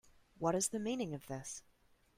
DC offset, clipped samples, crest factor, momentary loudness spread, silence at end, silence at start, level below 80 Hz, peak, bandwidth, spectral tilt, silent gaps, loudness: under 0.1%; under 0.1%; 20 dB; 12 LU; 0.6 s; 0.4 s; -70 dBFS; -22 dBFS; 16 kHz; -4 dB/octave; none; -39 LUFS